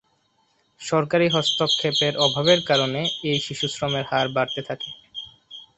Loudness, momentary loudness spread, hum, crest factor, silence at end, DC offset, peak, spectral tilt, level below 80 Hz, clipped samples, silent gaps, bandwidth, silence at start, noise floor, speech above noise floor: -21 LUFS; 17 LU; none; 20 dB; 0.15 s; under 0.1%; -2 dBFS; -4 dB/octave; -60 dBFS; under 0.1%; none; 8.2 kHz; 0.8 s; -66 dBFS; 44 dB